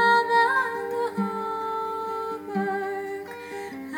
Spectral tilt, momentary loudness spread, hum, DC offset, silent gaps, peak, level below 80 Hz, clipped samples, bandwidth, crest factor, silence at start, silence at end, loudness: -5 dB/octave; 15 LU; none; under 0.1%; none; -10 dBFS; -74 dBFS; under 0.1%; 18 kHz; 16 dB; 0 s; 0 s; -26 LUFS